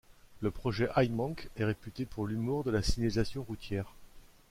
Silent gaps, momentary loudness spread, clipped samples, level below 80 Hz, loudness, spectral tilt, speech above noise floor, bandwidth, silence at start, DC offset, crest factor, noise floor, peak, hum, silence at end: none; 9 LU; under 0.1%; -46 dBFS; -34 LUFS; -6.5 dB/octave; 21 dB; 16 kHz; 0.1 s; under 0.1%; 18 dB; -54 dBFS; -16 dBFS; none; 0.3 s